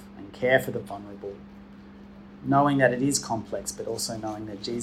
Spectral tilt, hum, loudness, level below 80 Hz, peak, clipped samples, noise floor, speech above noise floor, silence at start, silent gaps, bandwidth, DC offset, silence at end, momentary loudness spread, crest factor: -4.5 dB/octave; none; -26 LUFS; -56 dBFS; -6 dBFS; under 0.1%; -46 dBFS; 20 dB; 0 s; none; 16 kHz; under 0.1%; 0 s; 25 LU; 22 dB